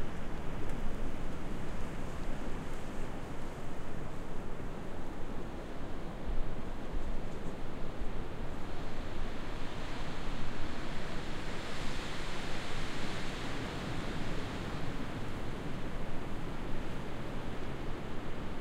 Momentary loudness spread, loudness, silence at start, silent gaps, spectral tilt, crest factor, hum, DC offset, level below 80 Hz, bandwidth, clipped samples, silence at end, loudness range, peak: 4 LU; -42 LUFS; 0 s; none; -5.5 dB/octave; 14 dB; none; under 0.1%; -38 dBFS; 9.4 kHz; under 0.1%; 0 s; 4 LU; -18 dBFS